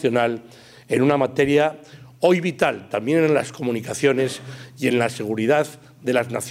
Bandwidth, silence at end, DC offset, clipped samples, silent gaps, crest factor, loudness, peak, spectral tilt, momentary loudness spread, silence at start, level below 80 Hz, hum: 16 kHz; 0 s; under 0.1%; under 0.1%; none; 16 dB; -21 LUFS; -4 dBFS; -5.5 dB/octave; 9 LU; 0 s; -62 dBFS; none